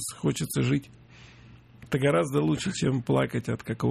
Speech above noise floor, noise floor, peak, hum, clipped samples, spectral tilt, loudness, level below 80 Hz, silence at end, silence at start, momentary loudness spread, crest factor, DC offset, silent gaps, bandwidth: 25 dB; -51 dBFS; -12 dBFS; none; under 0.1%; -6 dB/octave; -27 LUFS; -54 dBFS; 0 s; 0 s; 7 LU; 16 dB; under 0.1%; none; 14 kHz